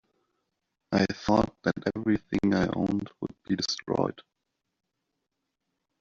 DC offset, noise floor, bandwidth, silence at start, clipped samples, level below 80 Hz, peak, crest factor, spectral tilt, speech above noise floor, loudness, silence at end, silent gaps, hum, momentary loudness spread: under 0.1%; -83 dBFS; 7.4 kHz; 0.9 s; under 0.1%; -56 dBFS; -8 dBFS; 22 dB; -5 dB/octave; 55 dB; -28 LUFS; 1.8 s; none; none; 7 LU